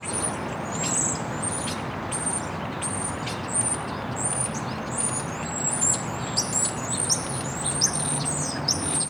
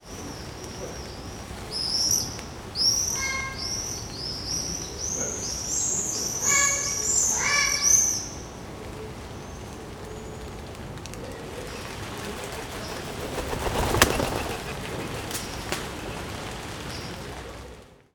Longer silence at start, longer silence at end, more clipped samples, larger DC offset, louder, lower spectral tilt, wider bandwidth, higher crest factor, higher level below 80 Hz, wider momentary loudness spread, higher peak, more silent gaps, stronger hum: about the same, 0 s vs 0 s; second, 0 s vs 0.2 s; neither; neither; about the same, -25 LUFS vs -25 LUFS; about the same, -2.5 dB/octave vs -1.5 dB/octave; about the same, over 20 kHz vs over 20 kHz; second, 22 dB vs 28 dB; second, -52 dBFS vs -44 dBFS; second, 8 LU vs 18 LU; second, -6 dBFS vs 0 dBFS; neither; neither